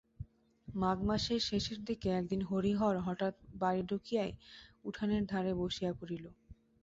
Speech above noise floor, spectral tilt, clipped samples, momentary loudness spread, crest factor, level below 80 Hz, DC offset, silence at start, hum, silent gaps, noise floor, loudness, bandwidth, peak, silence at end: 20 dB; -5 dB/octave; under 0.1%; 14 LU; 16 dB; -56 dBFS; under 0.1%; 0.2 s; none; none; -55 dBFS; -36 LUFS; 7.8 kHz; -20 dBFS; 0.3 s